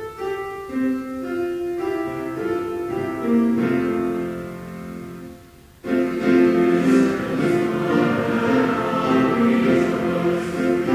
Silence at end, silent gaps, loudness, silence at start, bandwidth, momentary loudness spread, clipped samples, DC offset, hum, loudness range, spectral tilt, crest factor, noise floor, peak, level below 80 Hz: 0 s; none; -21 LUFS; 0 s; 16 kHz; 14 LU; under 0.1%; under 0.1%; none; 5 LU; -7 dB/octave; 16 dB; -46 dBFS; -6 dBFS; -50 dBFS